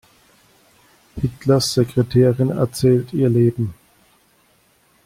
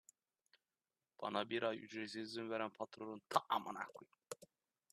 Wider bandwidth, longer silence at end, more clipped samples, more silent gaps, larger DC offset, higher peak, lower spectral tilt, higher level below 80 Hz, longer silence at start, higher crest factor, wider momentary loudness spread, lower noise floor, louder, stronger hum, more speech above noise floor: first, 15.5 kHz vs 13.5 kHz; first, 1.3 s vs 0.5 s; neither; neither; neither; first, -4 dBFS vs -18 dBFS; first, -7 dB/octave vs -4 dB/octave; first, -48 dBFS vs under -90 dBFS; about the same, 1.15 s vs 1.2 s; second, 16 dB vs 28 dB; second, 11 LU vs 16 LU; second, -58 dBFS vs under -90 dBFS; first, -18 LUFS vs -44 LUFS; neither; second, 41 dB vs over 46 dB